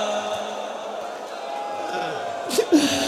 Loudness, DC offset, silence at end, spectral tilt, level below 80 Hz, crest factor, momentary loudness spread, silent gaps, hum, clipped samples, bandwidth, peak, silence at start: -26 LUFS; under 0.1%; 0 s; -3 dB/octave; -64 dBFS; 18 dB; 13 LU; none; none; under 0.1%; 15.5 kHz; -6 dBFS; 0 s